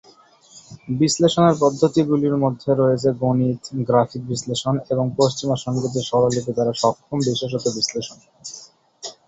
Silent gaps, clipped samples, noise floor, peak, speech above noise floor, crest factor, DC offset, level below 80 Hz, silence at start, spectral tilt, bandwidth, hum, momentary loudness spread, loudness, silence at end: none; under 0.1%; -51 dBFS; -2 dBFS; 31 dB; 18 dB; under 0.1%; -56 dBFS; 0.55 s; -5.5 dB/octave; 8.4 kHz; none; 17 LU; -20 LUFS; 0.15 s